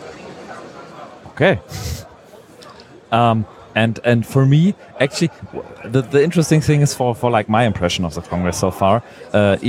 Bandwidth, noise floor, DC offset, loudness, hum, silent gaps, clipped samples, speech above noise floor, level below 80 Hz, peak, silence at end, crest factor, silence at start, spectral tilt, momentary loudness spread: 15.5 kHz; -43 dBFS; under 0.1%; -17 LUFS; none; none; under 0.1%; 26 dB; -44 dBFS; 0 dBFS; 0 s; 16 dB; 0 s; -6 dB/octave; 20 LU